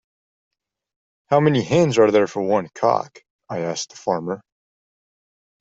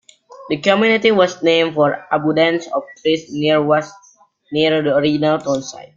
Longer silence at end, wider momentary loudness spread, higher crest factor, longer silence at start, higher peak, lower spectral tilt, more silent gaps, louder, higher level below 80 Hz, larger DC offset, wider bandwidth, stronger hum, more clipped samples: first, 1.25 s vs 0.15 s; first, 14 LU vs 9 LU; about the same, 18 dB vs 16 dB; first, 1.3 s vs 0.4 s; about the same, -2 dBFS vs -2 dBFS; about the same, -6 dB/octave vs -5 dB/octave; first, 3.30-3.39 s vs none; second, -20 LUFS vs -16 LUFS; about the same, -62 dBFS vs -58 dBFS; neither; about the same, 8 kHz vs 7.6 kHz; neither; neither